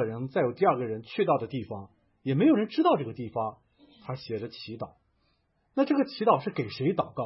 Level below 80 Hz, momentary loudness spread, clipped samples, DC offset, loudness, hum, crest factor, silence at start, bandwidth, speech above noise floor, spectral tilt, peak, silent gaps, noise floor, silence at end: -70 dBFS; 15 LU; under 0.1%; under 0.1%; -28 LUFS; none; 20 dB; 0 s; 5.8 kHz; 44 dB; -11 dB/octave; -10 dBFS; none; -71 dBFS; 0 s